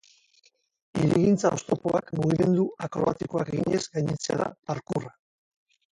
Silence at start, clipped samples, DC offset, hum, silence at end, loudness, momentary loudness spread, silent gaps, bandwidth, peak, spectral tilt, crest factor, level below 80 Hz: 0.95 s; under 0.1%; under 0.1%; none; 0.85 s; -26 LUFS; 10 LU; 4.59-4.63 s; 11.5 kHz; -8 dBFS; -6.5 dB/octave; 18 dB; -58 dBFS